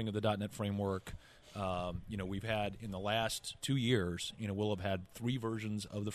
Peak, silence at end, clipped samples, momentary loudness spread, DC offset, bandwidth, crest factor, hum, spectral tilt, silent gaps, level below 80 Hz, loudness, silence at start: -18 dBFS; 0 s; under 0.1%; 7 LU; under 0.1%; 13.5 kHz; 18 dB; none; -5.5 dB/octave; none; -58 dBFS; -38 LUFS; 0 s